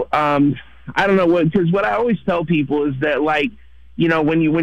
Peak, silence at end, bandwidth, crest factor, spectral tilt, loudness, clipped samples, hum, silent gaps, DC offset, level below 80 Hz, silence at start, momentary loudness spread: -6 dBFS; 0 s; 8.6 kHz; 12 dB; -8 dB/octave; -17 LUFS; under 0.1%; none; none; 0.5%; -46 dBFS; 0 s; 6 LU